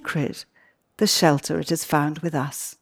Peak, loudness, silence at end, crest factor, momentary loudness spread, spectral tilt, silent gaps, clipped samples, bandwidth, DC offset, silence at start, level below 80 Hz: -4 dBFS; -23 LUFS; 0.1 s; 20 dB; 11 LU; -4 dB/octave; none; under 0.1%; over 20 kHz; under 0.1%; 0.05 s; -62 dBFS